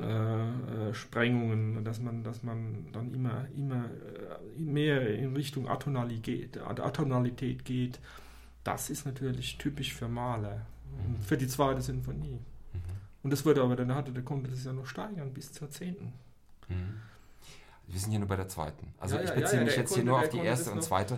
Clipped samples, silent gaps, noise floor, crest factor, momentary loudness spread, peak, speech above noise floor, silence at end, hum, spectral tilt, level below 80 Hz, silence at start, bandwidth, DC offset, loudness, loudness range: under 0.1%; none; -53 dBFS; 20 dB; 15 LU; -14 dBFS; 20 dB; 0 s; none; -6 dB/octave; -54 dBFS; 0 s; 16.5 kHz; under 0.1%; -33 LUFS; 7 LU